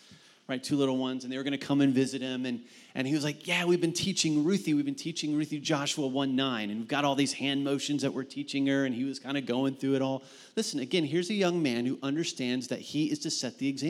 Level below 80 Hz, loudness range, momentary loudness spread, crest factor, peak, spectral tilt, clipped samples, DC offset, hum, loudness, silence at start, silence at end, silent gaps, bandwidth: -76 dBFS; 2 LU; 7 LU; 18 dB; -12 dBFS; -4.5 dB/octave; under 0.1%; under 0.1%; none; -30 LUFS; 0.1 s; 0 s; none; 13.5 kHz